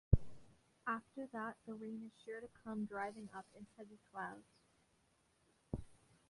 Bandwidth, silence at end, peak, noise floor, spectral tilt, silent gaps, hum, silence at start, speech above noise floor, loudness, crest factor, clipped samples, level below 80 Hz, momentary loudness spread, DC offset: 11.5 kHz; 0.35 s; -16 dBFS; -77 dBFS; -8 dB/octave; none; none; 0.1 s; 28 dB; -46 LUFS; 30 dB; under 0.1%; -52 dBFS; 14 LU; under 0.1%